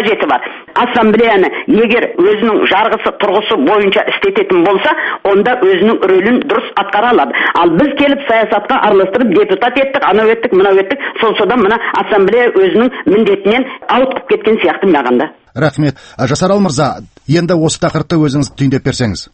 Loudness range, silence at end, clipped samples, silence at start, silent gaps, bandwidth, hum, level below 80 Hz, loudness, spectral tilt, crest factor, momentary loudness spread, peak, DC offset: 3 LU; 0.1 s; under 0.1%; 0 s; none; 8.8 kHz; none; -44 dBFS; -11 LUFS; -5.5 dB/octave; 10 dB; 5 LU; 0 dBFS; under 0.1%